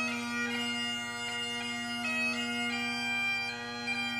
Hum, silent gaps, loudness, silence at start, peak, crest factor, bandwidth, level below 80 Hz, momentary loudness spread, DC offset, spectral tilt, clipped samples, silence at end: 50 Hz at -60 dBFS; none; -32 LUFS; 0 s; -22 dBFS; 12 dB; 15.5 kHz; -68 dBFS; 5 LU; under 0.1%; -2 dB/octave; under 0.1%; 0 s